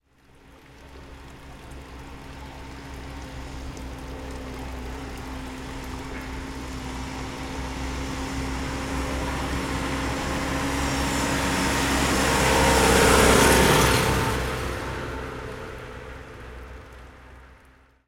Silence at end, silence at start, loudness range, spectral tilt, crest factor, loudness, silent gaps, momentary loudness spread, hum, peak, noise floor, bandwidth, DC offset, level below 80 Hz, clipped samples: 0.55 s; 0.5 s; 20 LU; -4 dB/octave; 22 dB; -24 LUFS; none; 24 LU; none; -4 dBFS; -55 dBFS; 16.5 kHz; under 0.1%; -34 dBFS; under 0.1%